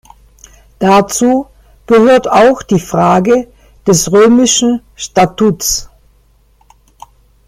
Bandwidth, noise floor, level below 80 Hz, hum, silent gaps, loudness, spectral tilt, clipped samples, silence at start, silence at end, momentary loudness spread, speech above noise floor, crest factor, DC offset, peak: 16 kHz; -49 dBFS; -40 dBFS; none; none; -10 LUFS; -4.5 dB/octave; under 0.1%; 0.8 s; 1.6 s; 9 LU; 40 dB; 12 dB; under 0.1%; 0 dBFS